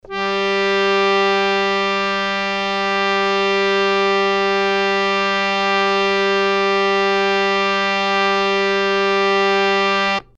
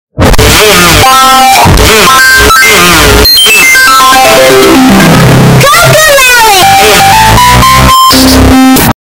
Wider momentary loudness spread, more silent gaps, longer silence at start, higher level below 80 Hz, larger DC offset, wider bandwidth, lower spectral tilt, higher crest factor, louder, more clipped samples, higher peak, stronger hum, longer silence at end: about the same, 3 LU vs 2 LU; neither; about the same, 0.05 s vs 0.15 s; second, -52 dBFS vs -16 dBFS; neither; second, 8.8 kHz vs over 20 kHz; about the same, -3.5 dB/octave vs -3 dB/octave; first, 14 dB vs 2 dB; second, -16 LUFS vs -1 LUFS; second, under 0.1% vs 30%; second, -4 dBFS vs 0 dBFS; neither; about the same, 0.15 s vs 0.1 s